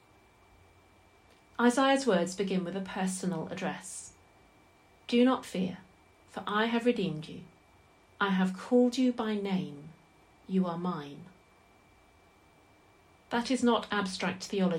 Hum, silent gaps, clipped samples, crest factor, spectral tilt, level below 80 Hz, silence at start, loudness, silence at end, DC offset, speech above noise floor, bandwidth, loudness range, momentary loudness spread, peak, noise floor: none; none; under 0.1%; 18 dB; -5.5 dB/octave; -70 dBFS; 1.6 s; -30 LUFS; 0 s; under 0.1%; 32 dB; 13.5 kHz; 7 LU; 18 LU; -14 dBFS; -62 dBFS